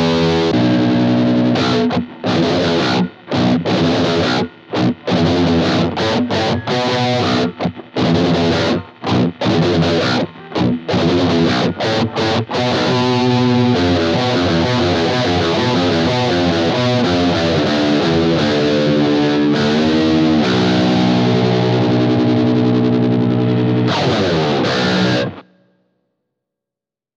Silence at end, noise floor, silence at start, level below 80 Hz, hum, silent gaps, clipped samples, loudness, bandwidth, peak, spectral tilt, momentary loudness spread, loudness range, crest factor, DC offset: 1.75 s; -87 dBFS; 0 s; -46 dBFS; none; none; under 0.1%; -15 LUFS; 8.2 kHz; -2 dBFS; -6.5 dB/octave; 4 LU; 2 LU; 14 dB; under 0.1%